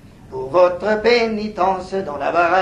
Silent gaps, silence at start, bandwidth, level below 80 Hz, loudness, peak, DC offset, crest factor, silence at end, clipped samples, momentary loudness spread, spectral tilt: none; 0.05 s; 9.8 kHz; -46 dBFS; -18 LUFS; -2 dBFS; under 0.1%; 14 dB; 0 s; under 0.1%; 9 LU; -5.5 dB/octave